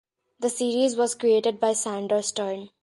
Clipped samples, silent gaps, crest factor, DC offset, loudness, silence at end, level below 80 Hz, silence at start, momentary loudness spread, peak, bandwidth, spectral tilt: under 0.1%; none; 16 dB; under 0.1%; -24 LUFS; 0.15 s; -76 dBFS; 0.4 s; 8 LU; -10 dBFS; 11.5 kHz; -3 dB/octave